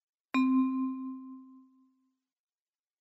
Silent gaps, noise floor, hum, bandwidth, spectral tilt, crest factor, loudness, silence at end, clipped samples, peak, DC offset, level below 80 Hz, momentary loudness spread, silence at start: none; under -90 dBFS; none; 7.8 kHz; -5 dB/octave; 16 dB; -31 LUFS; 1.4 s; under 0.1%; -18 dBFS; under 0.1%; -80 dBFS; 21 LU; 0.35 s